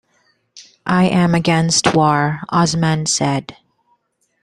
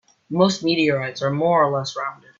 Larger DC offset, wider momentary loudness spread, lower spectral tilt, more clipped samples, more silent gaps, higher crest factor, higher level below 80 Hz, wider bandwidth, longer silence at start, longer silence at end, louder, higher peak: neither; second, 6 LU vs 10 LU; about the same, -4.5 dB/octave vs -5.5 dB/octave; neither; neither; about the same, 16 dB vs 18 dB; first, -50 dBFS vs -62 dBFS; first, 11.5 kHz vs 7.6 kHz; first, 0.55 s vs 0.3 s; first, 0.9 s vs 0.25 s; first, -15 LUFS vs -20 LUFS; about the same, -2 dBFS vs -4 dBFS